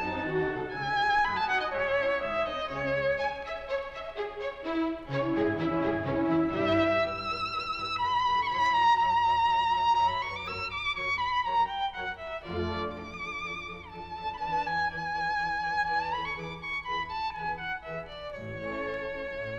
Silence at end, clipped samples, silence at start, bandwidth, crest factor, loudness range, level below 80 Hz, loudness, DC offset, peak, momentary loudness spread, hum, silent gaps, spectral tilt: 0 s; under 0.1%; 0 s; 8.6 kHz; 16 dB; 7 LU; -54 dBFS; -29 LUFS; under 0.1%; -14 dBFS; 11 LU; none; none; -5.5 dB/octave